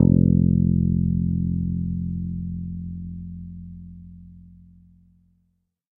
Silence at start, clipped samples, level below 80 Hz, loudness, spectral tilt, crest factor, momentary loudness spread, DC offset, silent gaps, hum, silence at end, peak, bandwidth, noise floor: 0 s; under 0.1%; -38 dBFS; -23 LUFS; -15.5 dB/octave; 22 dB; 22 LU; under 0.1%; none; none; 1.5 s; -2 dBFS; 1 kHz; -70 dBFS